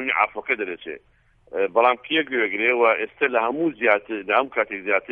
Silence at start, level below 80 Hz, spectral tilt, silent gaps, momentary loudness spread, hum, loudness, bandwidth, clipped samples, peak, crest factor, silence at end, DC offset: 0 s; -64 dBFS; -7 dB/octave; none; 10 LU; none; -21 LUFS; 4.6 kHz; under 0.1%; -4 dBFS; 20 dB; 0 s; under 0.1%